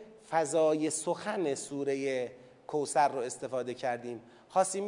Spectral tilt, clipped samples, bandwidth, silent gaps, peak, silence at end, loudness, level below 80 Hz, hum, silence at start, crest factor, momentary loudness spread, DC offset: -4 dB/octave; under 0.1%; 11 kHz; none; -14 dBFS; 0 s; -32 LUFS; -80 dBFS; none; 0 s; 18 dB; 10 LU; under 0.1%